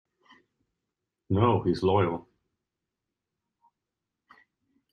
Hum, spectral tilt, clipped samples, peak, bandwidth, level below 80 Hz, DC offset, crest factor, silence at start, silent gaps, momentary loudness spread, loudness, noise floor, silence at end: none; -8.5 dB/octave; under 0.1%; -10 dBFS; 9.4 kHz; -62 dBFS; under 0.1%; 22 dB; 1.3 s; none; 7 LU; -26 LUFS; -87 dBFS; 2.7 s